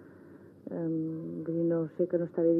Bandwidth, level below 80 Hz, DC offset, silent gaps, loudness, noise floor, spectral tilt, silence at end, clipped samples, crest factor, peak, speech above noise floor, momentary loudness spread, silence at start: 2.1 kHz; -86 dBFS; under 0.1%; none; -32 LUFS; -53 dBFS; -12.5 dB/octave; 0 s; under 0.1%; 16 dB; -16 dBFS; 24 dB; 19 LU; 0 s